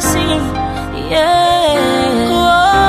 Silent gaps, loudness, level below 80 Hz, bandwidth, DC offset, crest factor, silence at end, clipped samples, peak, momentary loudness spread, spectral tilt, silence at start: none; -13 LUFS; -30 dBFS; 15.5 kHz; under 0.1%; 12 dB; 0 s; under 0.1%; -2 dBFS; 9 LU; -4 dB/octave; 0 s